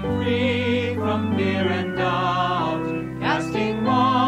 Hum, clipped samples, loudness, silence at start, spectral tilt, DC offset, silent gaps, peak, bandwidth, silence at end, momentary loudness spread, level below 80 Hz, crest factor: none; under 0.1%; -22 LUFS; 0 s; -6.5 dB/octave; under 0.1%; none; -8 dBFS; 12 kHz; 0 s; 3 LU; -48 dBFS; 14 dB